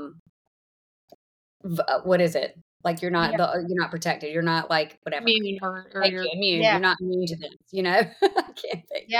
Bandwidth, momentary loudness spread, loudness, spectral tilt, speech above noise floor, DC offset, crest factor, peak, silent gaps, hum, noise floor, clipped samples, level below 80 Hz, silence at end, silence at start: 19.5 kHz; 12 LU; -24 LUFS; -5 dB/octave; over 65 dB; under 0.1%; 20 dB; -6 dBFS; 0.19-1.08 s, 1.14-1.60 s, 2.61-2.80 s, 4.97-5.02 s, 7.56-7.60 s; none; under -90 dBFS; under 0.1%; -66 dBFS; 0 s; 0 s